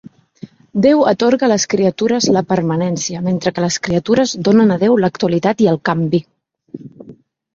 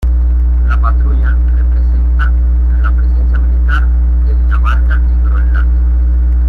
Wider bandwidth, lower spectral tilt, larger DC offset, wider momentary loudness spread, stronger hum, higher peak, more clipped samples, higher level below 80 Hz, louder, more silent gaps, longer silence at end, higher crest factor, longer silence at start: first, 7.8 kHz vs 3.2 kHz; second, -5.5 dB/octave vs -9 dB/octave; neither; first, 7 LU vs 1 LU; second, none vs 60 Hz at -10 dBFS; about the same, -2 dBFS vs -2 dBFS; neither; second, -52 dBFS vs -10 dBFS; second, -15 LUFS vs -12 LUFS; neither; first, 0.45 s vs 0 s; first, 14 dB vs 6 dB; first, 0.45 s vs 0 s